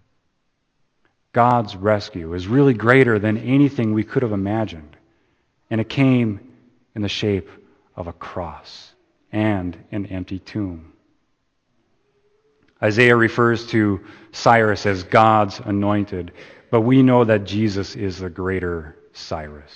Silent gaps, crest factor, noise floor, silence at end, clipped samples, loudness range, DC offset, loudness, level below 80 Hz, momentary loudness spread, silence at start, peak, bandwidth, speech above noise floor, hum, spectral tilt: none; 20 dB; -69 dBFS; 0.15 s; under 0.1%; 11 LU; under 0.1%; -19 LUFS; -50 dBFS; 17 LU; 1.35 s; 0 dBFS; 8.6 kHz; 51 dB; none; -7 dB/octave